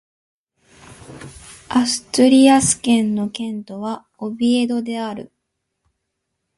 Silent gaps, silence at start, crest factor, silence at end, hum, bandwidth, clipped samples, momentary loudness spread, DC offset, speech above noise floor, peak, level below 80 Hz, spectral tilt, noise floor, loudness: none; 0.9 s; 18 dB; 1.35 s; none; 11.5 kHz; under 0.1%; 22 LU; under 0.1%; 59 dB; 0 dBFS; -54 dBFS; -3.5 dB/octave; -76 dBFS; -17 LUFS